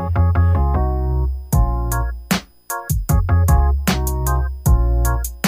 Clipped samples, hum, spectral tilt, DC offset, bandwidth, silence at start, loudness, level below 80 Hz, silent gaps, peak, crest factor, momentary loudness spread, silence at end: under 0.1%; none; -6 dB/octave; under 0.1%; 16 kHz; 0 s; -19 LUFS; -20 dBFS; none; -4 dBFS; 12 dB; 7 LU; 0 s